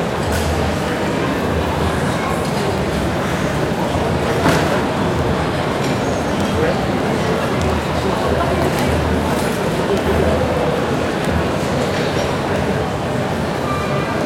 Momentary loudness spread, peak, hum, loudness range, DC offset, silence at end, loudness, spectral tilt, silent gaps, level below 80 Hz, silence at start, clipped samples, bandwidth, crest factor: 3 LU; -2 dBFS; none; 1 LU; under 0.1%; 0 s; -18 LUFS; -5.5 dB/octave; none; -34 dBFS; 0 s; under 0.1%; 16.5 kHz; 16 dB